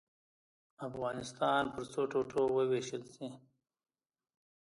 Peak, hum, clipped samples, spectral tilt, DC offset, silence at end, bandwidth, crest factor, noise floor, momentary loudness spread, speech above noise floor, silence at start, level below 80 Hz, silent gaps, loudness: -18 dBFS; none; under 0.1%; -5 dB/octave; under 0.1%; 1.4 s; 11.5 kHz; 20 dB; under -90 dBFS; 15 LU; over 55 dB; 0.8 s; -72 dBFS; none; -35 LUFS